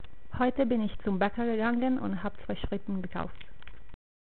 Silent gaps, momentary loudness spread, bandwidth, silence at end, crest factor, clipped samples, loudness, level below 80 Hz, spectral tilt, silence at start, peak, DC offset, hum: none; 12 LU; 4.5 kHz; 0.45 s; 18 dB; under 0.1%; -31 LUFS; -48 dBFS; -5.5 dB/octave; 0.05 s; -14 dBFS; 2%; none